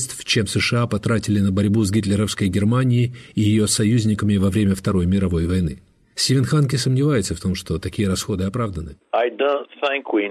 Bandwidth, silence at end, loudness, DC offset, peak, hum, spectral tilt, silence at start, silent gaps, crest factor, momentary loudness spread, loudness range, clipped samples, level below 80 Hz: 13.5 kHz; 0 s; -20 LUFS; under 0.1%; -4 dBFS; none; -5.5 dB/octave; 0 s; none; 14 dB; 7 LU; 3 LU; under 0.1%; -42 dBFS